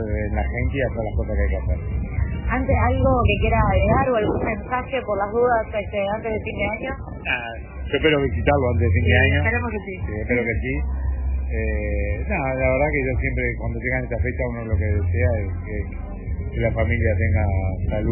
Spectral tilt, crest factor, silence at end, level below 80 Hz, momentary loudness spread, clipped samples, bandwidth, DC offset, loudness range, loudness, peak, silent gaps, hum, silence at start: -11 dB/octave; 18 dB; 0 s; -28 dBFS; 9 LU; under 0.1%; 3.1 kHz; under 0.1%; 4 LU; -22 LUFS; -4 dBFS; none; none; 0 s